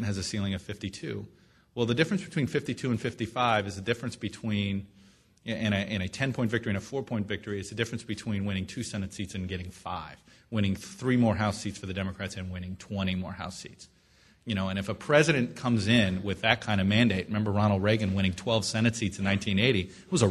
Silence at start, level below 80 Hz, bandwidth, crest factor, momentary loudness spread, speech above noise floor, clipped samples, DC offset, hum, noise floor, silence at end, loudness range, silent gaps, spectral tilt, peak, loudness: 0 s; -56 dBFS; 12.5 kHz; 24 dB; 13 LU; 33 dB; under 0.1%; under 0.1%; none; -61 dBFS; 0 s; 8 LU; none; -5.5 dB/octave; -6 dBFS; -29 LUFS